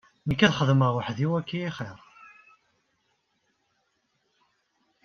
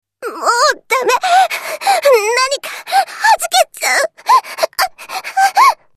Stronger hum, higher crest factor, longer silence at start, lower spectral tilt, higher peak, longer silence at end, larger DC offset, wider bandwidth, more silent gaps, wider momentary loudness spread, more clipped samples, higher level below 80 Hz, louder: neither; first, 24 dB vs 14 dB; about the same, 0.25 s vs 0.2 s; first, -6.5 dB/octave vs 1.5 dB/octave; second, -4 dBFS vs 0 dBFS; first, 3.1 s vs 0.2 s; neither; second, 7 kHz vs 14 kHz; neither; first, 13 LU vs 8 LU; neither; about the same, -58 dBFS vs -60 dBFS; second, -25 LUFS vs -13 LUFS